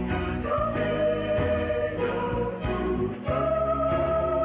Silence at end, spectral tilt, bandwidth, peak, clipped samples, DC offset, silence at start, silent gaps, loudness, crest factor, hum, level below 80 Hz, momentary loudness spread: 0 s; -11 dB/octave; 4 kHz; -14 dBFS; under 0.1%; under 0.1%; 0 s; none; -27 LUFS; 12 dB; none; -38 dBFS; 4 LU